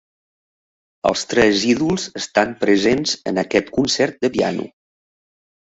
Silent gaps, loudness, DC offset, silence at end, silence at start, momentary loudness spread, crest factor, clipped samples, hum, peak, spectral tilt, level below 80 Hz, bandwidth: none; -18 LUFS; under 0.1%; 1.05 s; 1.05 s; 7 LU; 18 dB; under 0.1%; none; -2 dBFS; -4 dB/octave; -50 dBFS; 8.4 kHz